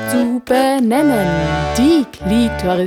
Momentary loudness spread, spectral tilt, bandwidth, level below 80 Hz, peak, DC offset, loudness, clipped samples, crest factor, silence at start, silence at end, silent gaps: 4 LU; -5.5 dB/octave; 19 kHz; -34 dBFS; -2 dBFS; under 0.1%; -15 LUFS; under 0.1%; 12 dB; 0 s; 0 s; none